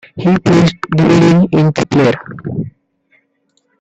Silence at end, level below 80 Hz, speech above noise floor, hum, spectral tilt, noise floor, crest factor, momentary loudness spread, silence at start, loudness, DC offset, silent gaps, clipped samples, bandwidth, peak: 1.1 s; -44 dBFS; 52 dB; none; -7 dB/octave; -61 dBFS; 12 dB; 14 LU; 0.15 s; -12 LUFS; under 0.1%; none; under 0.1%; 8.2 kHz; 0 dBFS